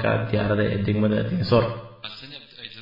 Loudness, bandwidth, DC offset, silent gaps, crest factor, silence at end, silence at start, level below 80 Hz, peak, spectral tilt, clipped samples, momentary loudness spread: -23 LUFS; 5.4 kHz; under 0.1%; none; 18 dB; 0 s; 0 s; -48 dBFS; -6 dBFS; -9 dB/octave; under 0.1%; 17 LU